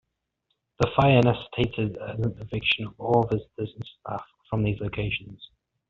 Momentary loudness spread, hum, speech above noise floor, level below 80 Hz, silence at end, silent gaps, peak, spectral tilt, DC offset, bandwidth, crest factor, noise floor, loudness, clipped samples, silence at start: 16 LU; none; 52 dB; -50 dBFS; 0.45 s; none; -4 dBFS; -5 dB/octave; under 0.1%; 7.2 kHz; 22 dB; -77 dBFS; -26 LUFS; under 0.1%; 0.8 s